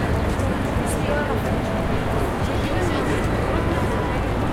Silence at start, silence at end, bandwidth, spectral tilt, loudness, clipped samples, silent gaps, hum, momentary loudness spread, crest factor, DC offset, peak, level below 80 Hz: 0 s; 0 s; 16.5 kHz; -6.5 dB/octave; -23 LUFS; under 0.1%; none; none; 1 LU; 12 dB; under 0.1%; -10 dBFS; -30 dBFS